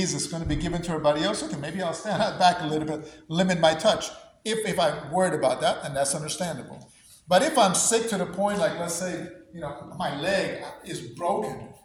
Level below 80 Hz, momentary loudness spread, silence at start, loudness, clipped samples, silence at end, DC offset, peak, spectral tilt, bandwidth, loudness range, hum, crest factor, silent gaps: -50 dBFS; 15 LU; 0 s; -25 LUFS; under 0.1%; 0.1 s; under 0.1%; -6 dBFS; -3.5 dB/octave; over 20 kHz; 4 LU; none; 20 dB; none